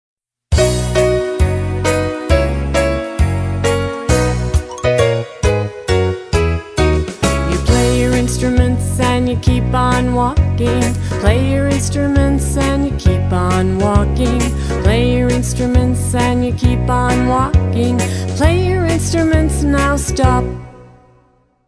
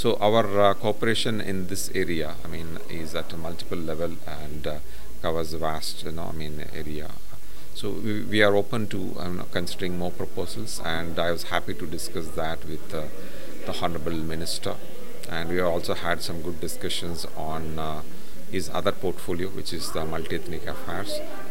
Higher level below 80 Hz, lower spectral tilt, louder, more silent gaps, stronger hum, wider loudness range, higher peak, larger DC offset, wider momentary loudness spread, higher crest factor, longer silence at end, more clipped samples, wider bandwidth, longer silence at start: first, -20 dBFS vs -46 dBFS; first, -6 dB/octave vs -4.5 dB/octave; first, -15 LUFS vs -29 LUFS; neither; neither; second, 2 LU vs 5 LU; first, 0 dBFS vs -4 dBFS; second, under 0.1% vs 9%; second, 4 LU vs 13 LU; second, 14 dB vs 26 dB; first, 0.8 s vs 0 s; neither; second, 11 kHz vs 16.5 kHz; first, 0.5 s vs 0 s